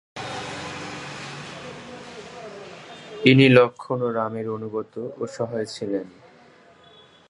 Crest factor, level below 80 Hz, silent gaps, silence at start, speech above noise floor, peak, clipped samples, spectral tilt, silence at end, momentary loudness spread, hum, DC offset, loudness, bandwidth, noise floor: 24 dB; -62 dBFS; none; 0.15 s; 31 dB; 0 dBFS; under 0.1%; -6 dB/octave; 1.2 s; 24 LU; none; under 0.1%; -23 LUFS; 11 kHz; -52 dBFS